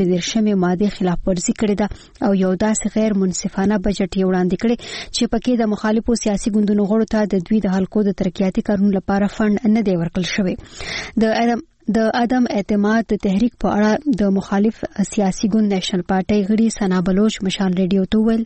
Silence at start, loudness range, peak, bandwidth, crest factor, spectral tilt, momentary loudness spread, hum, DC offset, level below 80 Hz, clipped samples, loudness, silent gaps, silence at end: 0 s; 1 LU; -6 dBFS; 8.8 kHz; 12 dB; -6 dB/octave; 4 LU; none; under 0.1%; -38 dBFS; under 0.1%; -18 LUFS; none; 0 s